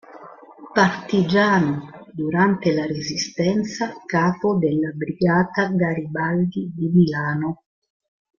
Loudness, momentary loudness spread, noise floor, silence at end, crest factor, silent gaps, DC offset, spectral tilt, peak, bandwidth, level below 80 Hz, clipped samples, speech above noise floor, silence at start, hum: -21 LUFS; 8 LU; -42 dBFS; 0.85 s; 18 dB; none; under 0.1%; -6 dB/octave; -4 dBFS; 7.2 kHz; -58 dBFS; under 0.1%; 22 dB; 0.1 s; none